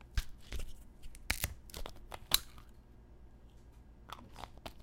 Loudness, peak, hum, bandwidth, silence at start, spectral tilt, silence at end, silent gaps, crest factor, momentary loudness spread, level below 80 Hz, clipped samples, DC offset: -39 LUFS; -8 dBFS; 60 Hz at -60 dBFS; 17 kHz; 0 s; -1.5 dB/octave; 0 s; none; 34 dB; 27 LU; -46 dBFS; under 0.1%; under 0.1%